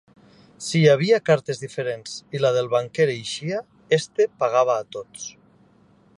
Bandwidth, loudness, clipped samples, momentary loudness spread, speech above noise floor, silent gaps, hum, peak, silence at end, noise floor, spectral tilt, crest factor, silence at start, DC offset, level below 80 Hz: 11.5 kHz; -22 LUFS; under 0.1%; 16 LU; 35 dB; none; none; -4 dBFS; 0.85 s; -56 dBFS; -5 dB/octave; 20 dB; 0.6 s; under 0.1%; -68 dBFS